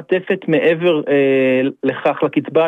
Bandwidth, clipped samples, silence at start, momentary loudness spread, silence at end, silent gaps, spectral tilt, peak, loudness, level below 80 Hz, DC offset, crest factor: 4.2 kHz; under 0.1%; 0 s; 5 LU; 0 s; none; -8 dB/octave; -2 dBFS; -16 LUFS; -68 dBFS; under 0.1%; 14 dB